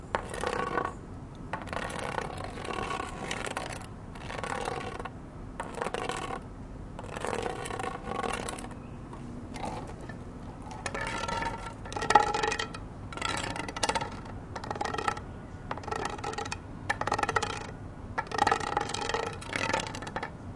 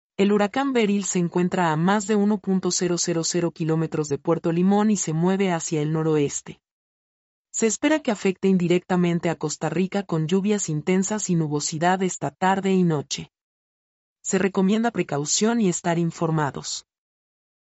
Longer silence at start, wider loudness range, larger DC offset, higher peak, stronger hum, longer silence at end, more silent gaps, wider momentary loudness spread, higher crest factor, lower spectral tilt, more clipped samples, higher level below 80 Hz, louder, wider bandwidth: second, 0 s vs 0.2 s; first, 7 LU vs 2 LU; neither; first, -4 dBFS vs -8 dBFS; neither; second, 0 s vs 0.95 s; second, none vs 6.71-7.45 s, 13.41-14.16 s; first, 14 LU vs 5 LU; first, 32 dB vs 14 dB; about the same, -4 dB/octave vs -5 dB/octave; neither; first, -48 dBFS vs -64 dBFS; second, -34 LUFS vs -23 LUFS; first, 11.5 kHz vs 8.2 kHz